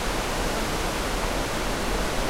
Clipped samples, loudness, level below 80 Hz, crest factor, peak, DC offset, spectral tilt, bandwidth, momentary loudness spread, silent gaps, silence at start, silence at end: under 0.1%; -27 LUFS; -32 dBFS; 14 dB; -14 dBFS; under 0.1%; -3.5 dB/octave; 16 kHz; 1 LU; none; 0 s; 0 s